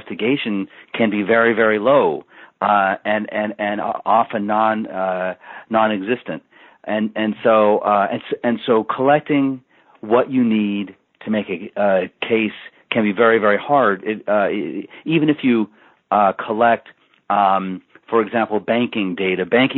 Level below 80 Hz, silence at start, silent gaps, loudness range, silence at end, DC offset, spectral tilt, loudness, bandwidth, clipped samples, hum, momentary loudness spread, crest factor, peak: -66 dBFS; 0.05 s; none; 3 LU; 0 s; under 0.1%; -4 dB/octave; -18 LUFS; 4.2 kHz; under 0.1%; none; 11 LU; 16 dB; -2 dBFS